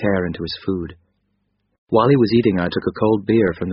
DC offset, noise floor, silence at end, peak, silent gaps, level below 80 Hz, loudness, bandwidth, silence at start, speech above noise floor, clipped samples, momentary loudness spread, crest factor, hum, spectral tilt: under 0.1%; -69 dBFS; 0 s; -2 dBFS; 1.78-1.87 s; -48 dBFS; -18 LUFS; 5.8 kHz; 0 s; 51 dB; under 0.1%; 11 LU; 16 dB; 50 Hz at -50 dBFS; -6 dB/octave